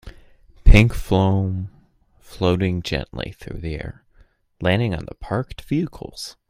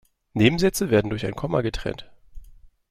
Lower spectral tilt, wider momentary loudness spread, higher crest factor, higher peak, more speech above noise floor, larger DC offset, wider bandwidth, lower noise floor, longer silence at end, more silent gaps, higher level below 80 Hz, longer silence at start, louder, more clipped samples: first, -7 dB/octave vs -5.5 dB/octave; first, 17 LU vs 14 LU; about the same, 20 dB vs 22 dB; about the same, 0 dBFS vs -2 dBFS; first, 34 dB vs 26 dB; neither; about the same, 15 kHz vs 16.5 kHz; first, -55 dBFS vs -48 dBFS; second, 0.2 s vs 0.35 s; neither; first, -24 dBFS vs -42 dBFS; second, 0.05 s vs 0.35 s; about the same, -22 LUFS vs -23 LUFS; neither